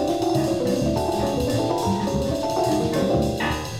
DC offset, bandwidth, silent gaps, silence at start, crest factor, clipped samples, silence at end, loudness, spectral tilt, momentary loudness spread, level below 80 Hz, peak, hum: under 0.1%; 16.5 kHz; none; 0 s; 12 dB; under 0.1%; 0 s; -23 LUFS; -6 dB/octave; 2 LU; -38 dBFS; -10 dBFS; none